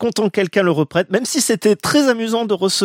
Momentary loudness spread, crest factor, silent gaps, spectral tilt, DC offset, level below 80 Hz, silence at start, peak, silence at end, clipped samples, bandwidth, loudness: 3 LU; 16 dB; none; -4 dB/octave; under 0.1%; -58 dBFS; 0 s; 0 dBFS; 0 s; under 0.1%; 16.5 kHz; -17 LUFS